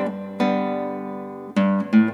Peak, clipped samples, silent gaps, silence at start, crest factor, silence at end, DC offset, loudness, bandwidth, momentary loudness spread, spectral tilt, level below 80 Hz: -6 dBFS; under 0.1%; none; 0 s; 16 dB; 0 s; under 0.1%; -23 LUFS; 7.2 kHz; 13 LU; -8 dB/octave; -72 dBFS